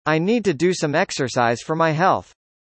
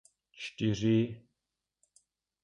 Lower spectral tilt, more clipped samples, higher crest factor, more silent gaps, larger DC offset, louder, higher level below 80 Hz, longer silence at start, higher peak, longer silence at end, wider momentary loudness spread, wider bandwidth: second, -5 dB/octave vs -6.5 dB/octave; neither; about the same, 16 dB vs 18 dB; neither; neither; first, -20 LUFS vs -31 LUFS; about the same, -60 dBFS vs -64 dBFS; second, 0.05 s vs 0.4 s; first, -4 dBFS vs -18 dBFS; second, 0.45 s vs 1.25 s; second, 3 LU vs 16 LU; second, 8.8 kHz vs 10 kHz